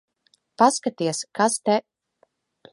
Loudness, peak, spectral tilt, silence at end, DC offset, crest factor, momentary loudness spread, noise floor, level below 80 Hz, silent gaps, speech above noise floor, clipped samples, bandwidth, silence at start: -22 LUFS; -2 dBFS; -3.5 dB/octave; 0.95 s; under 0.1%; 22 dB; 7 LU; -66 dBFS; -74 dBFS; none; 45 dB; under 0.1%; 11.5 kHz; 0.6 s